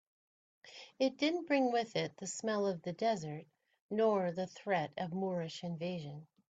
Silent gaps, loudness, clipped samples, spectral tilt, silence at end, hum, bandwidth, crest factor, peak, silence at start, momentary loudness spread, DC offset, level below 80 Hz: 3.82-3.89 s; -36 LUFS; under 0.1%; -5 dB/octave; 0.25 s; none; 9.2 kHz; 18 dB; -18 dBFS; 0.65 s; 15 LU; under 0.1%; -80 dBFS